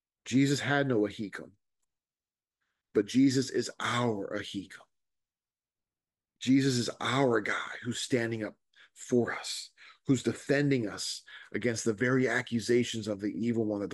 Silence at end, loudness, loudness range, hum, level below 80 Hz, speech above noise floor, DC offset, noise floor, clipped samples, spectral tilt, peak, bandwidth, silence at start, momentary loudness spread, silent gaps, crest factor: 0 s; -30 LUFS; 3 LU; none; -72 dBFS; over 60 dB; under 0.1%; under -90 dBFS; under 0.1%; -5 dB/octave; -14 dBFS; 12 kHz; 0.25 s; 13 LU; none; 18 dB